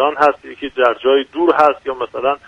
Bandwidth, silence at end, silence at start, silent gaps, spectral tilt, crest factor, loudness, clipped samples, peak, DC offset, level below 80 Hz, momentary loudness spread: 9.6 kHz; 0.1 s; 0 s; none; -5 dB/octave; 16 dB; -15 LUFS; under 0.1%; 0 dBFS; under 0.1%; -54 dBFS; 11 LU